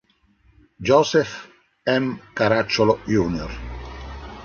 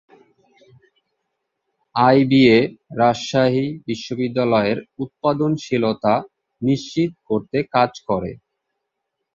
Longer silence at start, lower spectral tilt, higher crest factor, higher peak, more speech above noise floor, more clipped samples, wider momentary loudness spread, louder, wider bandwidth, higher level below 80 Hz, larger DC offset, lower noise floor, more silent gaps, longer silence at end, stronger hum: second, 0.8 s vs 1.95 s; about the same, -5.5 dB/octave vs -6.5 dB/octave; about the same, 20 dB vs 18 dB; about the same, -2 dBFS vs -2 dBFS; second, 39 dB vs 60 dB; neither; first, 18 LU vs 12 LU; about the same, -21 LUFS vs -19 LUFS; about the same, 7.2 kHz vs 7.6 kHz; first, -40 dBFS vs -56 dBFS; neither; second, -59 dBFS vs -78 dBFS; neither; second, 0 s vs 1 s; neither